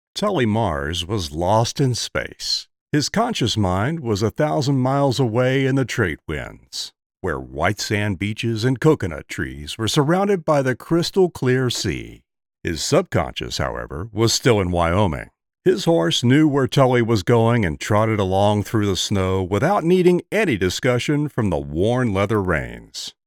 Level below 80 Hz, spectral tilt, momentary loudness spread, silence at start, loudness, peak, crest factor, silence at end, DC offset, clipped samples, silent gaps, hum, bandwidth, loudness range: -44 dBFS; -5.5 dB/octave; 11 LU; 0.15 s; -20 LUFS; -2 dBFS; 18 dB; 0.15 s; under 0.1%; under 0.1%; 2.81-2.87 s, 7.06-7.10 s; none; 17 kHz; 4 LU